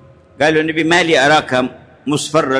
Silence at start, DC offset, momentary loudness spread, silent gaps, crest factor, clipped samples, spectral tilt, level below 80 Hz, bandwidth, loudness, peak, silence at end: 0.4 s; under 0.1%; 10 LU; none; 14 dB; under 0.1%; -4 dB/octave; -52 dBFS; 11 kHz; -14 LUFS; -2 dBFS; 0 s